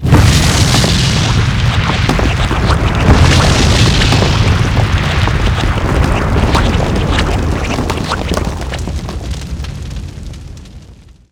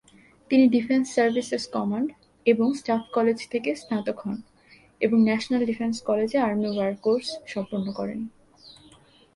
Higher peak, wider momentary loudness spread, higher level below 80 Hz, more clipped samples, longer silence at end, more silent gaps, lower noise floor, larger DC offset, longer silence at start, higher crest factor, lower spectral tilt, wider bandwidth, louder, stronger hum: first, 0 dBFS vs -6 dBFS; first, 14 LU vs 11 LU; first, -18 dBFS vs -64 dBFS; first, 0.2% vs under 0.1%; second, 0.35 s vs 0.65 s; neither; second, -37 dBFS vs -55 dBFS; neither; second, 0 s vs 0.5 s; second, 12 dB vs 18 dB; about the same, -5 dB/octave vs -5.5 dB/octave; first, 17 kHz vs 11.5 kHz; first, -12 LUFS vs -25 LUFS; neither